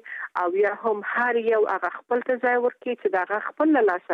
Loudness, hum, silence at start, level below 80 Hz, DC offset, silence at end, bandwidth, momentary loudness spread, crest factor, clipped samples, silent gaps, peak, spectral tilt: -24 LUFS; none; 0.05 s; -78 dBFS; under 0.1%; 0 s; 5.2 kHz; 6 LU; 14 dB; under 0.1%; none; -10 dBFS; -6.5 dB/octave